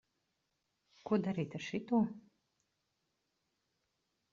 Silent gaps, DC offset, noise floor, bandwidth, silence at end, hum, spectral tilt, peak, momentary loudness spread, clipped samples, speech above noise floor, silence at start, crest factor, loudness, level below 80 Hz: none; under 0.1%; -84 dBFS; 7.4 kHz; 2.1 s; none; -6.5 dB/octave; -20 dBFS; 15 LU; under 0.1%; 49 dB; 1.05 s; 20 dB; -37 LUFS; -80 dBFS